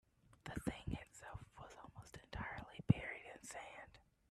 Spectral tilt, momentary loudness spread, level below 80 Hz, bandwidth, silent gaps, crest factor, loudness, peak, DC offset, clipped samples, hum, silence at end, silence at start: -6 dB/octave; 20 LU; -62 dBFS; 13.5 kHz; none; 30 dB; -46 LUFS; -16 dBFS; under 0.1%; under 0.1%; none; 0.3 s; 0.3 s